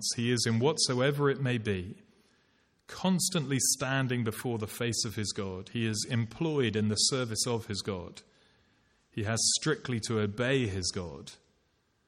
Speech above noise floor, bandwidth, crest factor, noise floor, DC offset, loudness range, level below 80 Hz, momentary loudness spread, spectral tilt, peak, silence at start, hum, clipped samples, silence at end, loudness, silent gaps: 42 dB; 16.5 kHz; 18 dB; -73 dBFS; under 0.1%; 1 LU; -64 dBFS; 11 LU; -4 dB/octave; -14 dBFS; 0 s; none; under 0.1%; 0.75 s; -30 LUFS; none